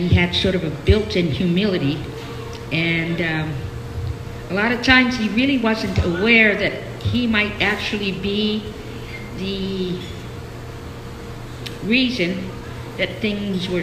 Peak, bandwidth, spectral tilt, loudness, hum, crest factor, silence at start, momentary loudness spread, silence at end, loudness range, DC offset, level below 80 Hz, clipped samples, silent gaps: 0 dBFS; 15 kHz; -6 dB/octave; -19 LUFS; none; 20 dB; 0 s; 18 LU; 0 s; 9 LU; under 0.1%; -36 dBFS; under 0.1%; none